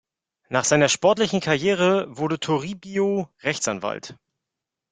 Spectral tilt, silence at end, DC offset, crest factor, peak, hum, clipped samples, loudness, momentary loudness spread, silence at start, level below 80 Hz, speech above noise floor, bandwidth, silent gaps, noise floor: -4 dB/octave; 0.8 s; under 0.1%; 20 dB; -4 dBFS; none; under 0.1%; -22 LUFS; 11 LU; 0.5 s; -62 dBFS; 63 dB; 9.6 kHz; none; -85 dBFS